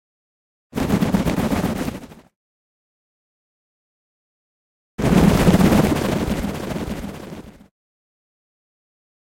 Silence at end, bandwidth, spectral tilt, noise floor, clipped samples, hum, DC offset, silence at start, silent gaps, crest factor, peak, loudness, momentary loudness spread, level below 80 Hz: 1.8 s; 16.5 kHz; -6.5 dB/octave; under -90 dBFS; under 0.1%; none; under 0.1%; 0.75 s; 2.36-4.98 s; 22 dB; 0 dBFS; -19 LUFS; 20 LU; -36 dBFS